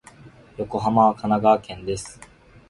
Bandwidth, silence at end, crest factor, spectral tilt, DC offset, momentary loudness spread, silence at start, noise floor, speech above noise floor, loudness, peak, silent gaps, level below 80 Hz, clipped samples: 11.5 kHz; 0.55 s; 20 dB; -6.5 dB/octave; under 0.1%; 16 LU; 0.25 s; -47 dBFS; 26 dB; -21 LUFS; -4 dBFS; none; -50 dBFS; under 0.1%